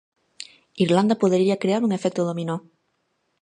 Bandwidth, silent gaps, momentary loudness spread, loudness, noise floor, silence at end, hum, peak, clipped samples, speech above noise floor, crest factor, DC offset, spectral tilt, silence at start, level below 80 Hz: 10.5 kHz; none; 21 LU; -22 LUFS; -72 dBFS; 0.85 s; none; -6 dBFS; under 0.1%; 51 dB; 18 dB; under 0.1%; -6.5 dB/octave; 0.4 s; -68 dBFS